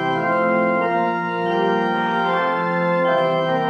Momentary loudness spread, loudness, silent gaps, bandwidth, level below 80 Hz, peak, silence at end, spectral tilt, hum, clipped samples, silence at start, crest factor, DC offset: 2 LU; -19 LUFS; none; 7.8 kHz; -74 dBFS; -6 dBFS; 0 s; -7.5 dB/octave; none; under 0.1%; 0 s; 12 dB; under 0.1%